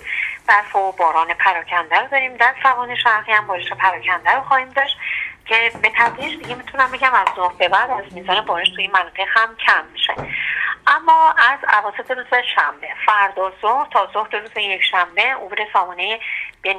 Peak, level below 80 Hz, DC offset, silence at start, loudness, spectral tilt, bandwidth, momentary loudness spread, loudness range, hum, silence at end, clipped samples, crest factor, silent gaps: 0 dBFS; -58 dBFS; under 0.1%; 0 s; -17 LUFS; -2.5 dB/octave; 10.5 kHz; 8 LU; 2 LU; none; 0 s; under 0.1%; 18 dB; none